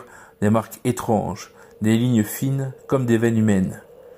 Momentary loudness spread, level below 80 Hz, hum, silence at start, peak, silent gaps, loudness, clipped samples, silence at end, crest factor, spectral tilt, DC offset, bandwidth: 10 LU; -54 dBFS; none; 0 s; -6 dBFS; none; -21 LUFS; under 0.1%; 0.1 s; 16 dB; -7 dB/octave; under 0.1%; 16.5 kHz